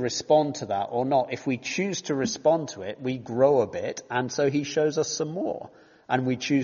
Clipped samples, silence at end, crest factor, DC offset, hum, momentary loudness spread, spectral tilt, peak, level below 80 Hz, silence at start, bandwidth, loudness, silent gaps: under 0.1%; 0 s; 18 dB; under 0.1%; none; 10 LU; -4.5 dB/octave; -8 dBFS; -66 dBFS; 0 s; 7.2 kHz; -26 LUFS; none